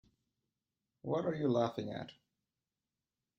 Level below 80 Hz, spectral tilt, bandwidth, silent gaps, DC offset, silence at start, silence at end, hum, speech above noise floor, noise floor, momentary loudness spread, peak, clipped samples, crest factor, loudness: -76 dBFS; -7.5 dB/octave; 7.2 kHz; none; under 0.1%; 1.05 s; 1.25 s; none; over 54 dB; under -90 dBFS; 15 LU; -20 dBFS; under 0.1%; 20 dB; -37 LUFS